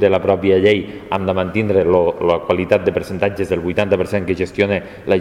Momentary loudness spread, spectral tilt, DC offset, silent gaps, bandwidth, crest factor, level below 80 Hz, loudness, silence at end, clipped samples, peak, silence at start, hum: 7 LU; -7 dB/octave; under 0.1%; none; 13 kHz; 16 dB; -44 dBFS; -17 LUFS; 0 s; under 0.1%; 0 dBFS; 0 s; none